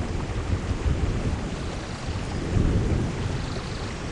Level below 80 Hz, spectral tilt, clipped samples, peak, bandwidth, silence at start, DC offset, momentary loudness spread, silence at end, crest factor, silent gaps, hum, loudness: -30 dBFS; -6.5 dB/octave; under 0.1%; -8 dBFS; 10.5 kHz; 0 s; under 0.1%; 8 LU; 0 s; 18 dB; none; none; -28 LUFS